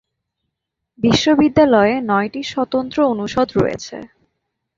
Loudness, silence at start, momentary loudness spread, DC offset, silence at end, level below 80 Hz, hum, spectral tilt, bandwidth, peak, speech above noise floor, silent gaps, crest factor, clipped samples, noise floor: -16 LUFS; 1 s; 10 LU; under 0.1%; 0.7 s; -46 dBFS; none; -5.5 dB/octave; 7.6 kHz; -2 dBFS; 62 dB; none; 16 dB; under 0.1%; -78 dBFS